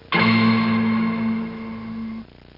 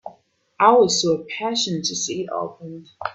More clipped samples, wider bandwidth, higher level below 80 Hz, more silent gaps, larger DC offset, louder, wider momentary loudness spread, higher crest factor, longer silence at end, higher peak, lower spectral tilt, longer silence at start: neither; second, 5.6 kHz vs 8.4 kHz; first, -54 dBFS vs -66 dBFS; neither; neither; about the same, -20 LUFS vs -20 LUFS; about the same, 16 LU vs 17 LU; second, 14 dB vs 20 dB; first, 0.35 s vs 0 s; second, -6 dBFS vs 0 dBFS; first, -8.5 dB/octave vs -3 dB/octave; about the same, 0.1 s vs 0.05 s